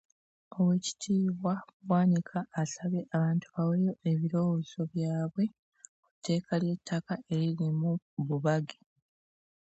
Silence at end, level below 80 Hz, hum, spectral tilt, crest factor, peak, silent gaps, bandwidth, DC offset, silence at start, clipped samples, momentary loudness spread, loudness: 0.95 s; -74 dBFS; none; -7 dB/octave; 16 dB; -16 dBFS; 1.73-1.80 s, 5.59-5.72 s, 5.89-6.03 s, 6.11-6.22 s, 8.02-8.17 s; 8.2 kHz; under 0.1%; 0.5 s; under 0.1%; 7 LU; -31 LUFS